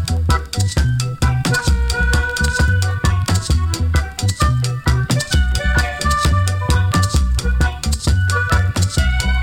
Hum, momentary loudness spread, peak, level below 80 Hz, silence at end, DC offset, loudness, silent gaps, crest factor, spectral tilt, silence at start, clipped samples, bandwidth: none; 3 LU; -2 dBFS; -20 dBFS; 0 s; under 0.1%; -17 LUFS; none; 14 dB; -4.5 dB/octave; 0 s; under 0.1%; 17 kHz